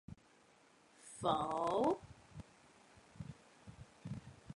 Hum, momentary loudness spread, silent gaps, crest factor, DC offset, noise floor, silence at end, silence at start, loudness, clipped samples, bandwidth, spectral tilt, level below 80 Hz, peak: none; 24 LU; none; 22 dB; under 0.1%; -68 dBFS; 0 s; 0.1 s; -39 LUFS; under 0.1%; 11.5 kHz; -6 dB/octave; -68 dBFS; -22 dBFS